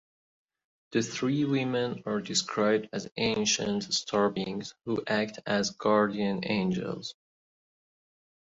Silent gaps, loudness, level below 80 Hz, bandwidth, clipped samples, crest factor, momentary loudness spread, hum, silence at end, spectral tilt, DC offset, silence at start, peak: none; -29 LUFS; -66 dBFS; 8 kHz; under 0.1%; 18 dB; 8 LU; none; 1.4 s; -4 dB/octave; under 0.1%; 0.9 s; -12 dBFS